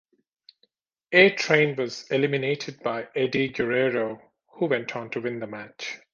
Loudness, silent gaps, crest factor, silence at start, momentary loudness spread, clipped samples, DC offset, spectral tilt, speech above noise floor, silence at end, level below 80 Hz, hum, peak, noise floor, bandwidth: -24 LUFS; none; 22 dB; 1.1 s; 17 LU; under 0.1%; under 0.1%; -5 dB/octave; 45 dB; 0.2 s; -66 dBFS; none; -4 dBFS; -69 dBFS; 7.4 kHz